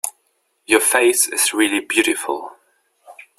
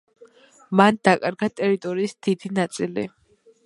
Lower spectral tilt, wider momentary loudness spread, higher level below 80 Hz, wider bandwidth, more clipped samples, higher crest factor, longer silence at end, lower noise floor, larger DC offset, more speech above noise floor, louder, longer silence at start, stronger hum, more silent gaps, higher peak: second, 0 dB/octave vs -6 dB/octave; first, 14 LU vs 10 LU; about the same, -62 dBFS vs -66 dBFS; first, 16 kHz vs 11.5 kHz; neither; about the same, 20 dB vs 22 dB; second, 0.25 s vs 0.55 s; first, -66 dBFS vs -51 dBFS; neither; first, 49 dB vs 30 dB; first, -17 LUFS vs -22 LUFS; second, 0.05 s vs 0.7 s; neither; neither; about the same, 0 dBFS vs 0 dBFS